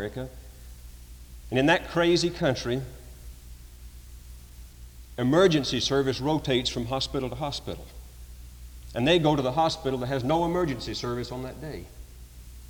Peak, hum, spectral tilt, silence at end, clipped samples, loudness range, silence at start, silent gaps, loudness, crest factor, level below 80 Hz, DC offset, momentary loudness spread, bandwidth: -10 dBFS; none; -5 dB/octave; 0 s; under 0.1%; 4 LU; 0 s; none; -26 LUFS; 18 dB; -44 dBFS; under 0.1%; 25 LU; over 20 kHz